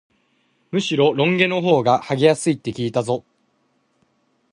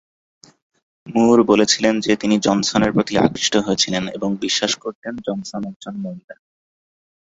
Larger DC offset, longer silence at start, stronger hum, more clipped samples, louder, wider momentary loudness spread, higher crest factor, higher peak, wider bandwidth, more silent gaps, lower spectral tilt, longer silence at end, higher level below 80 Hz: neither; second, 0.75 s vs 1.05 s; neither; neither; about the same, -19 LUFS vs -18 LUFS; second, 8 LU vs 15 LU; about the same, 20 dB vs 18 dB; about the same, -2 dBFS vs -2 dBFS; first, 11.5 kHz vs 8 kHz; second, none vs 4.95-5.02 s, 5.76-5.80 s, 6.24-6.28 s; first, -5.5 dB/octave vs -4 dB/octave; first, 1.3 s vs 1.05 s; second, -62 dBFS vs -52 dBFS